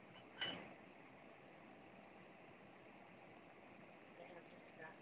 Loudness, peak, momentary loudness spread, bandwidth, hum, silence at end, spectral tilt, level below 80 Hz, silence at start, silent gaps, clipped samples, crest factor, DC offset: -56 LUFS; -34 dBFS; 15 LU; 4 kHz; none; 0 s; -1.5 dB/octave; -86 dBFS; 0 s; none; under 0.1%; 24 dB; under 0.1%